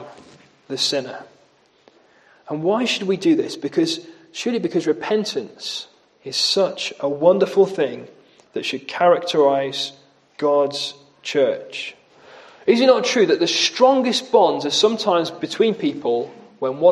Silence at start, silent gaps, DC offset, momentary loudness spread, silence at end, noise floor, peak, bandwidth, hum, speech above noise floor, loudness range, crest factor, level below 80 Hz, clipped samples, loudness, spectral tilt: 0 s; none; under 0.1%; 14 LU; 0 s; -57 dBFS; 0 dBFS; 12.5 kHz; none; 38 dB; 6 LU; 20 dB; -72 dBFS; under 0.1%; -19 LUFS; -3.5 dB/octave